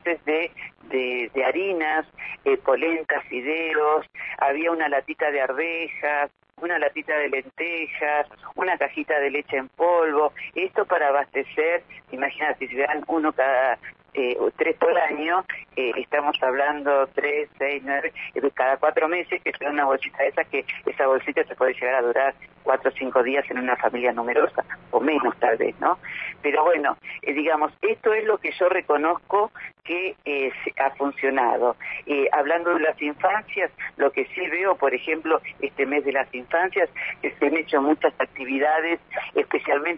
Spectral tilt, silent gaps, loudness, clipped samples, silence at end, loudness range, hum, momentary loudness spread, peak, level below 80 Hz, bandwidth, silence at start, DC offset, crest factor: -7 dB/octave; none; -23 LUFS; under 0.1%; 0 s; 2 LU; none; 6 LU; -6 dBFS; -66 dBFS; 5.6 kHz; 0.05 s; under 0.1%; 18 dB